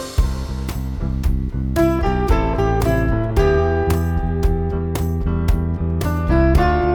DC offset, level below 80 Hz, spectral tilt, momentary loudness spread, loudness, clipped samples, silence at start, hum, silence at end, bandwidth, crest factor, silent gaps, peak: under 0.1%; -22 dBFS; -7.5 dB/octave; 7 LU; -19 LUFS; under 0.1%; 0 s; none; 0 s; 20 kHz; 14 dB; none; -4 dBFS